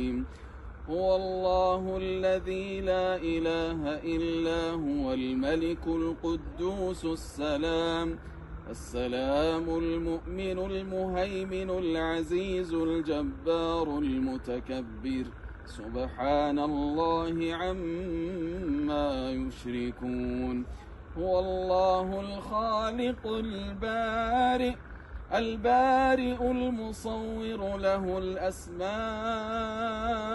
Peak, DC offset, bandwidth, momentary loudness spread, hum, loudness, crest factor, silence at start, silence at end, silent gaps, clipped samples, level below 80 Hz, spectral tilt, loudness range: -14 dBFS; under 0.1%; 11.5 kHz; 9 LU; none; -30 LUFS; 16 dB; 0 s; 0 s; none; under 0.1%; -44 dBFS; -6 dB/octave; 4 LU